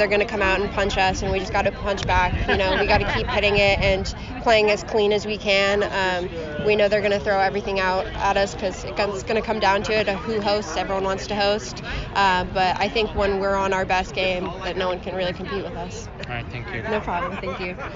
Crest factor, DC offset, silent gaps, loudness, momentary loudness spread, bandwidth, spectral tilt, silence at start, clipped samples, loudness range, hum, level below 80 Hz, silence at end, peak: 16 dB; under 0.1%; none; -22 LUFS; 10 LU; 7.4 kHz; -2.5 dB/octave; 0 s; under 0.1%; 5 LU; none; -36 dBFS; 0 s; -6 dBFS